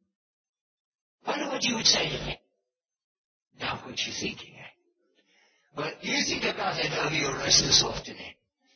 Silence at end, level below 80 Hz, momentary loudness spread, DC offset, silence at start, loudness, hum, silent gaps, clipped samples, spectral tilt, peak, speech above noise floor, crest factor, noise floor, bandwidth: 0.45 s; -54 dBFS; 20 LU; under 0.1%; 1.25 s; -26 LUFS; none; 3.04-3.51 s; under 0.1%; -1.5 dB/octave; -4 dBFS; 57 dB; 26 dB; -85 dBFS; 6.8 kHz